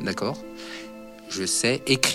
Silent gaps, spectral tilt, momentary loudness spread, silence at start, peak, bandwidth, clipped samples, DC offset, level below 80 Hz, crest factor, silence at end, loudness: none; -2.5 dB/octave; 17 LU; 0 s; -2 dBFS; 16 kHz; under 0.1%; under 0.1%; -58 dBFS; 26 dB; 0 s; -25 LUFS